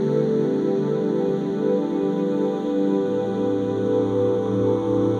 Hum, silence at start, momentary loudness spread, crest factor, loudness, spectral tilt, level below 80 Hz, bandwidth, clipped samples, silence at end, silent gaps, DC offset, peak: none; 0 s; 2 LU; 12 dB; -22 LUFS; -9 dB/octave; -58 dBFS; 8.8 kHz; under 0.1%; 0 s; none; under 0.1%; -10 dBFS